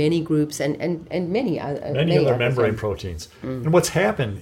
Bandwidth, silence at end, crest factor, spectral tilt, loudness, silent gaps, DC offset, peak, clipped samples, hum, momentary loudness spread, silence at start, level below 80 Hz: 16.5 kHz; 0 s; 18 dB; -6 dB/octave; -22 LUFS; none; under 0.1%; -4 dBFS; under 0.1%; none; 9 LU; 0 s; -48 dBFS